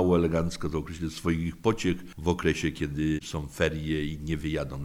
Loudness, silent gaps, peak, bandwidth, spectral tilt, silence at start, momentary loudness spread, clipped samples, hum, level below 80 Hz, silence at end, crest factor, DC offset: -29 LUFS; none; -10 dBFS; 16 kHz; -6 dB/octave; 0 s; 6 LU; under 0.1%; none; -42 dBFS; 0 s; 18 dB; under 0.1%